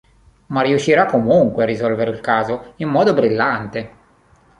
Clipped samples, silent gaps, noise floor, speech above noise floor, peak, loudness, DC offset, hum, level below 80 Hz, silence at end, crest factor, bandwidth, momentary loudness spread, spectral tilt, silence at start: under 0.1%; none; -53 dBFS; 36 dB; -2 dBFS; -17 LUFS; under 0.1%; none; -52 dBFS; 0.7 s; 16 dB; 10.5 kHz; 10 LU; -6.5 dB/octave; 0.5 s